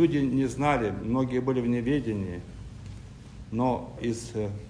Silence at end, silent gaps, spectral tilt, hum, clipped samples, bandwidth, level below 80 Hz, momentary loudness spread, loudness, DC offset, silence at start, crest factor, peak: 0 s; none; -7 dB/octave; none; under 0.1%; 10.5 kHz; -48 dBFS; 18 LU; -28 LUFS; under 0.1%; 0 s; 18 dB; -10 dBFS